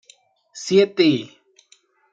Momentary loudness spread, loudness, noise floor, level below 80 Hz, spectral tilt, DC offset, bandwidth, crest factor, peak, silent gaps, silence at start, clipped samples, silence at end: 18 LU; -18 LUFS; -58 dBFS; -68 dBFS; -5 dB/octave; under 0.1%; 8.6 kHz; 18 dB; -4 dBFS; none; 0.55 s; under 0.1%; 0.85 s